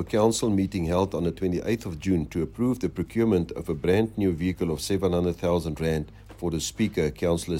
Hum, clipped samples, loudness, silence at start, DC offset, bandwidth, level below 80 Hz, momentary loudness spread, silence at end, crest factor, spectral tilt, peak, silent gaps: none; under 0.1%; -26 LUFS; 0 s; under 0.1%; 16.5 kHz; -44 dBFS; 5 LU; 0 s; 16 dB; -6 dB/octave; -8 dBFS; none